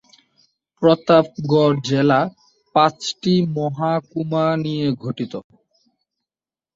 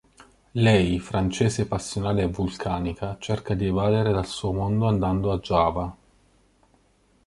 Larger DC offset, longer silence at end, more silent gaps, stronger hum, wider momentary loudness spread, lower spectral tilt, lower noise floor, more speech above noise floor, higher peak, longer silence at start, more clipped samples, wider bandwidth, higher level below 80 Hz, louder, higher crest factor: neither; about the same, 1.35 s vs 1.3 s; neither; neither; about the same, 10 LU vs 8 LU; about the same, -6.5 dB/octave vs -6.5 dB/octave; first, under -90 dBFS vs -62 dBFS; first, over 72 dB vs 39 dB; first, -2 dBFS vs -6 dBFS; first, 0.8 s vs 0.55 s; neither; second, 7.8 kHz vs 11.5 kHz; second, -60 dBFS vs -42 dBFS; first, -19 LUFS vs -24 LUFS; about the same, 18 dB vs 20 dB